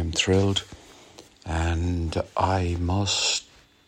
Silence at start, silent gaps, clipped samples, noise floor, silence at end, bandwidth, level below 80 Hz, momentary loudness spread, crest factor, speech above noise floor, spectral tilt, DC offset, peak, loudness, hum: 0 s; none; under 0.1%; -50 dBFS; 0.45 s; 10.5 kHz; -38 dBFS; 8 LU; 18 dB; 26 dB; -4 dB/octave; under 0.1%; -6 dBFS; -25 LUFS; none